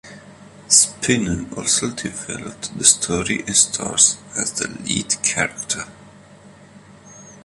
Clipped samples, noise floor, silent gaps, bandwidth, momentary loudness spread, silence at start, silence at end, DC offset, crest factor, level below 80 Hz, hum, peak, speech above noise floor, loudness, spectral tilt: under 0.1%; -45 dBFS; none; 16 kHz; 14 LU; 0.05 s; 0.05 s; under 0.1%; 22 dB; -48 dBFS; none; 0 dBFS; 25 dB; -18 LUFS; -1.5 dB/octave